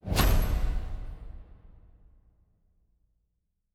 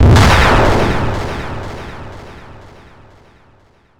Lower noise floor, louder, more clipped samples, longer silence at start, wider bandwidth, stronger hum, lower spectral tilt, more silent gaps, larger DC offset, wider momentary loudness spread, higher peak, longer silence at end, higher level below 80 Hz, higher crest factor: first, -78 dBFS vs -50 dBFS; second, -30 LUFS vs -12 LUFS; neither; about the same, 0.05 s vs 0 s; about the same, 18 kHz vs 17.5 kHz; neither; about the same, -5 dB/octave vs -5.5 dB/octave; neither; neither; about the same, 23 LU vs 24 LU; second, -10 dBFS vs 0 dBFS; first, 2.3 s vs 0 s; second, -32 dBFS vs -22 dBFS; first, 22 dB vs 14 dB